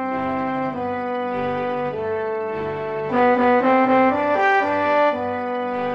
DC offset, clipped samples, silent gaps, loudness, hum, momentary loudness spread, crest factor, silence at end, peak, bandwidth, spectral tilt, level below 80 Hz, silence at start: 0.1%; under 0.1%; none; -20 LUFS; none; 9 LU; 14 dB; 0 s; -6 dBFS; 6.8 kHz; -7 dB/octave; -58 dBFS; 0 s